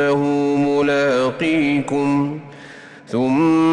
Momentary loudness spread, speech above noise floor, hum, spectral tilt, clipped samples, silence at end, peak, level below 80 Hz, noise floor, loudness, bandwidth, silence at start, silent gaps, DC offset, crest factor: 15 LU; 22 dB; none; -6.5 dB/octave; under 0.1%; 0 s; -8 dBFS; -56 dBFS; -39 dBFS; -18 LUFS; 10 kHz; 0 s; none; under 0.1%; 10 dB